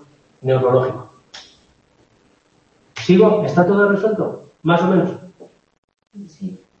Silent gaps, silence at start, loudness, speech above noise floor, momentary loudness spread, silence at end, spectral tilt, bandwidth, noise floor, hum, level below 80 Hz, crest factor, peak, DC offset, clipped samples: 5.78-5.88 s; 0.45 s; -16 LUFS; 42 dB; 23 LU; 0.25 s; -8 dB/octave; 7.4 kHz; -57 dBFS; none; -60 dBFS; 18 dB; 0 dBFS; under 0.1%; under 0.1%